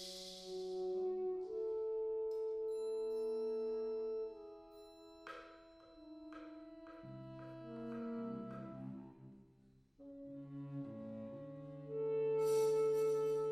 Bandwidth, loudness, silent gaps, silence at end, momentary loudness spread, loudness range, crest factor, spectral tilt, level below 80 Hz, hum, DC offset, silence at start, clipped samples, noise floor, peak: 14 kHz; -41 LUFS; none; 0 s; 22 LU; 12 LU; 16 dB; -6 dB/octave; -76 dBFS; none; under 0.1%; 0 s; under 0.1%; -68 dBFS; -26 dBFS